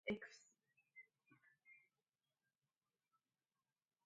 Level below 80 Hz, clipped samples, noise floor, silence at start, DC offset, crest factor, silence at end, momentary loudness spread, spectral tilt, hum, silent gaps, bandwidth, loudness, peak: -86 dBFS; under 0.1%; under -90 dBFS; 0.05 s; under 0.1%; 26 dB; 2.25 s; 19 LU; -5 dB/octave; none; none; 9 kHz; -54 LUFS; -32 dBFS